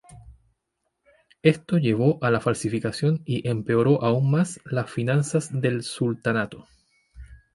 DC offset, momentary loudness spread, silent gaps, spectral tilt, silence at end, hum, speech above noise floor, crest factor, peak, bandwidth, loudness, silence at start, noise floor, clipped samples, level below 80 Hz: under 0.1%; 6 LU; none; -6.5 dB/octave; 0.2 s; none; 55 dB; 20 dB; -4 dBFS; 11.5 kHz; -24 LUFS; 0.1 s; -78 dBFS; under 0.1%; -54 dBFS